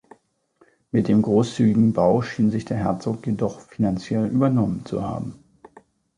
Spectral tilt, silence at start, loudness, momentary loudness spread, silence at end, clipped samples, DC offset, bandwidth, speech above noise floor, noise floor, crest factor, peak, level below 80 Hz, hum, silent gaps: -8 dB/octave; 0.95 s; -22 LUFS; 10 LU; 0.85 s; under 0.1%; under 0.1%; 10 kHz; 40 dB; -61 dBFS; 16 dB; -6 dBFS; -52 dBFS; none; none